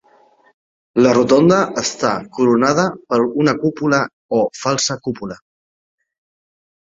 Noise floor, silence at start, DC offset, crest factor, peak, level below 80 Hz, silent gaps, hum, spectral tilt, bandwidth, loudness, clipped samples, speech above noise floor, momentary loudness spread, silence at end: -52 dBFS; 0.95 s; under 0.1%; 16 dB; 0 dBFS; -56 dBFS; 4.13-4.29 s; none; -5 dB/octave; 7.8 kHz; -16 LUFS; under 0.1%; 37 dB; 11 LU; 1.5 s